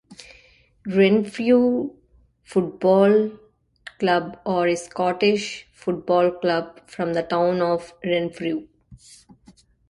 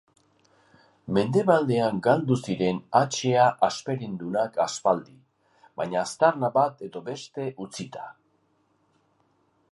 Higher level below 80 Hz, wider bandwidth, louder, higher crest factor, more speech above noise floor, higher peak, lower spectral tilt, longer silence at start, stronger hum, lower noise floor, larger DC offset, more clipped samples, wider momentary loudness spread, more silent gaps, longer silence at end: first, -60 dBFS vs -66 dBFS; about the same, 11.5 kHz vs 11.5 kHz; first, -22 LUFS vs -25 LUFS; about the same, 18 dB vs 20 dB; second, 36 dB vs 43 dB; about the same, -4 dBFS vs -6 dBFS; about the same, -6 dB/octave vs -5.5 dB/octave; second, 0.1 s vs 1.05 s; neither; second, -57 dBFS vs -68 dBFS; neither; neither; second, 11 LU vs 15 LU; neither; second, 0.95 s vs 1.6 s